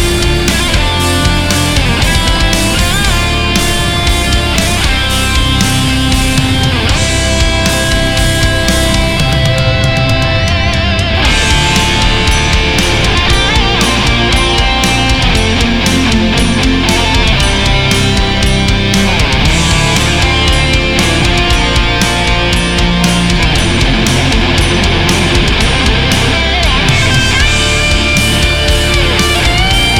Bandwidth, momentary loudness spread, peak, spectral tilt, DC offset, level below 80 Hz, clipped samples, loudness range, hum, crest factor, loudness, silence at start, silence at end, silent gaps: 17.5 kHz; 2 LU; 0 dBFS; -4 dB/octave; under 0.1%; -16 dBFS; under 0.1%; 1 LU; none; 10 dB; -10 LUFS; 0 s; 0 s; none